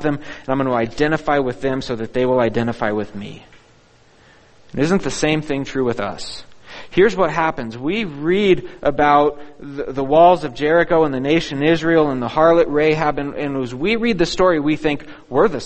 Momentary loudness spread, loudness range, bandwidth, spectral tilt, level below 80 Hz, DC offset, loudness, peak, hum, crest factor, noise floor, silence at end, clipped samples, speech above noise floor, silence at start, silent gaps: 12 LU; 7 LU; 8.8 kHz; -6 dB/octave; -42 dBFS; under 0.1%; -18 LUFS; 0 dBFS; none; 18 dB; -51 dBFS; 0 s; under 0.1%; 33 dB; 0 s; none